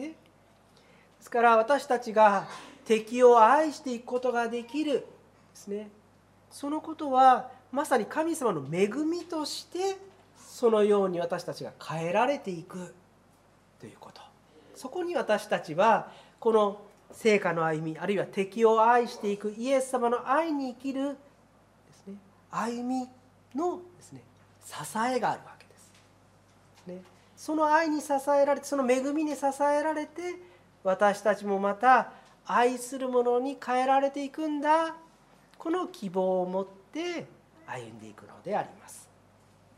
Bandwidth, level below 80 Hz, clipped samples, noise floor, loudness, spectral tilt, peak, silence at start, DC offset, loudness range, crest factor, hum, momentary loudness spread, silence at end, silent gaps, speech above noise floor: 15 kHz; -74 dBFS; under 0.1%; -61 dBFS; -27 LUFS; -5 dB/octave; -6 dBFS; 0 s; under 0.1%; 10 LU; 22 dB; none; 20 LU; 0.75 s; none; 34 dB